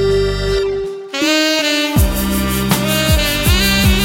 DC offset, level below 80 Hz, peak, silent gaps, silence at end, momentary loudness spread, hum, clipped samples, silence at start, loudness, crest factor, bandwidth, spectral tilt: under 0.1%; -22 dBFS; 0 dBFS; none; 0 s; 6 LU; none; under 0.1%; 0 s; -14 LUFS; 14 dB; 17 kHz; -4 dB/octave